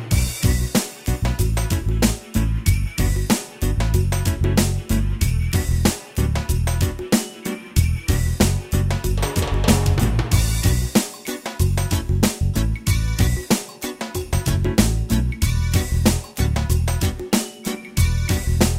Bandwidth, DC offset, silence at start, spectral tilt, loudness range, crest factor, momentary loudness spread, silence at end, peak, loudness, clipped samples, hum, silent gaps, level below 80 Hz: 16.5 kHz; under 0.1%; 0 s; -5 dB/octave; 2 LU; 18 dB; 5 LU; 0 s; 0 dBFS; -21 LUFS; under 0.1%; none; none; -24 dBFS